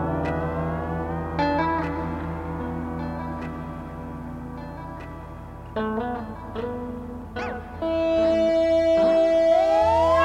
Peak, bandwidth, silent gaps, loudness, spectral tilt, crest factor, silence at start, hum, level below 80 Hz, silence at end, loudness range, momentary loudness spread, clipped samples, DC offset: -8 dBFS; 9.4 kHz; none; -24 LUFS; -7.5 dB/octave; 16 dB; 0 s; none; -40 dBFS; 0 s; 12 LU; 17 LU; under 0.1%; under 0.1%